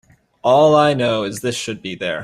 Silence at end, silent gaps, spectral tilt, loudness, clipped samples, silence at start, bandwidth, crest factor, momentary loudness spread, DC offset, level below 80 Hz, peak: 0 s; none; -5 dB/octave; -17 LUFS; under 0.1%; 0.45 s; 14 kHz; 16 dB; 13 LU; under 0.1%; -56 dBFS; -2 dBFS